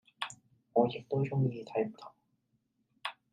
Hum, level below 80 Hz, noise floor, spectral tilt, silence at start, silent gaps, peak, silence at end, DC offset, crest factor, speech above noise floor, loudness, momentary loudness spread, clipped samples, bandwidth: none; -76 dBFS; -78 dBFS; -7 dB/octave; 0.2 s; none; -14 dBFS; 0.2 s; under 0.1%; 22 dB; 46 dB; -34 LUFS; 19 LU; under 0.1%; 10 kHz